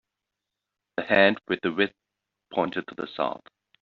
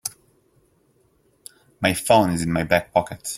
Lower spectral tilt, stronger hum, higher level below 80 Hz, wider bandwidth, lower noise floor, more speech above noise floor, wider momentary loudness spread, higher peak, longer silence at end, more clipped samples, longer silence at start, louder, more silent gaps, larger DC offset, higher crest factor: second, -2.5 dB/octave vs -4.5 dB/octave; neither; second, -68 dBFS vs -52 dBFS; second, 6.2 kHz vs 16.5 kHz; first, -86 dBFS vs -62 dBFS; first, 60 dB vs 42 dB; first, 16 LU vs 7 LU; second, -6 dBFS vs -2 dBFS; first, 0.45 s vs 0 s; neither; first, 1 s vs 0.05 s; second, -26 LUFS vs -21 LUFS; neither; neither; about the same, 22 dB vs 22 dB